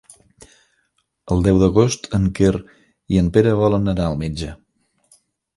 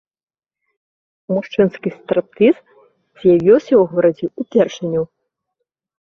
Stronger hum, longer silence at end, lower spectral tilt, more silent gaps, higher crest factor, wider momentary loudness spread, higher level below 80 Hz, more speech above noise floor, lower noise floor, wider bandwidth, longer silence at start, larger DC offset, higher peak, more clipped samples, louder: neither; about the same, 1 s vs 1.05 s; about the same, -7 dB/octave vs -7.5 dB/octave; neither; about the same, 18 dB vs 16 dB; about the same, 11 LU vs 11 LU; first, -34 dBFS vs -58 dBFS; second, 51 dB vs 62 dB; second, -68 dBFS vs -77 dBFS; first, 11.5 kHz vs 6.8 kHz; about the same, 1.25 s vs 1.3 s; neither; about the same, 0 dBFS vs -2 dBFS; neither; about the same, -18 LUFS vs -16 LUFS